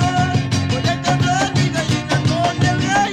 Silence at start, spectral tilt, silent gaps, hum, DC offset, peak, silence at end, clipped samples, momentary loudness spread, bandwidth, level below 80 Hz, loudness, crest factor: 0 s; -5 dB/octave; none; none; under 0.1%; -4 dBFS; 0 s; under 0.1%; 2 LU; 12 kHz; -42 dBFS; -17 LUFS; 14 dB